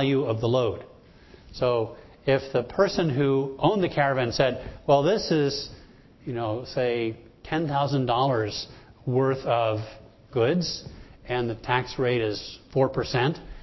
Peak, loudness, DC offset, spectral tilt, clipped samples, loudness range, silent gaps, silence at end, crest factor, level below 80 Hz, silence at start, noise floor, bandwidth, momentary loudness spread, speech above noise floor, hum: -6 dBFS; -26 LUFS; under 0.1%; -6.5 dB/octave; under 0.1%; 4 LU; none; 0 s; 20 dB; -50 dBFS; 0 s; -51 dBFS; 6.2 kHz; 12 LU; 26 dB; none